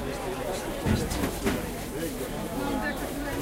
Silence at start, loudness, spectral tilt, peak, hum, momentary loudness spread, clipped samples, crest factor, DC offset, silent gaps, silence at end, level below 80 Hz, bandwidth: 0 s; -31 LUFS; -5 dB/octave; -12 dBFS; none; 5 LU; under 0.1%; 18 dB; under 0.1%; none; 0 s; -40 dBFS; 16 kHz